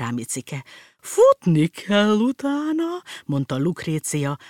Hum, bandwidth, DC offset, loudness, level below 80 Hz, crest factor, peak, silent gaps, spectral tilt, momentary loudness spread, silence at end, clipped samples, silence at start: none; 17 kHz; under 0.1%; -21 LUFS; -66 dBFS; 16 dB; -6 dBFS; none; -5.5 dB/octave; 13 LU; 0 s; under 0.1%; 0 s